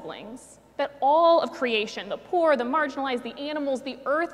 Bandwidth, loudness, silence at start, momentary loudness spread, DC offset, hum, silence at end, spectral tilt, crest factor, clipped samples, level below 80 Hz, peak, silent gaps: 11.5 kHz; -25 LUFS; 0 s; 19 LU; under 0.1%; none; 0 s; -4 dB/octave; 16 dB; under 0.1%; -68 dBFS; -10 dBFS; none